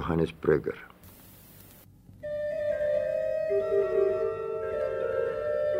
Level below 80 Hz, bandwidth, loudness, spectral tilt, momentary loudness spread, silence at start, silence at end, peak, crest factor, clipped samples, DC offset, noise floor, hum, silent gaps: -56 dBFS; 16 kHz; -29 LUFS; -7.5 dB/octave; 11 LU; 0 s; 0 s; -10 dBFS; 20 dB; under 0.1%; under 0.1%; -53 dBFS; none; none